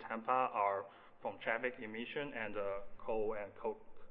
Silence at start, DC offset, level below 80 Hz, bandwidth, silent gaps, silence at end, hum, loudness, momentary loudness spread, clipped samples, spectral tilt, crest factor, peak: 0 s; under 0.1%; -62 dBFS; 4.4 kHz; none; 0 s; none; -40 LUFS; 11 LU; under 0.1%; -2.5 dB/octave; 20 dB; -20 dBFS